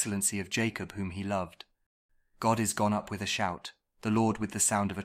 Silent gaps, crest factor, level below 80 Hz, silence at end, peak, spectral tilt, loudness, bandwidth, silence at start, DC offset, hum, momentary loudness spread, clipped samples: 1.86-2.09 s; 20 dB; -62 dBFS; 0 s; -12 dBFS; -4 dB/octave; -30 LUFS; 16 kHz; 0 s; under 0.1%; none; 10 LU; under 0.1%